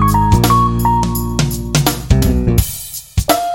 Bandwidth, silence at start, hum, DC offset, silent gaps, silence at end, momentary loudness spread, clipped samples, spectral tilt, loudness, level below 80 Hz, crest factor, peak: 17 kHz; 0 s; none; under 0.1%; none; 0 s; 7 LU; under 0.1%; -5.5 dB/octave; -14 LUFS; -22 dBFS; 14 dB; 0 dBFS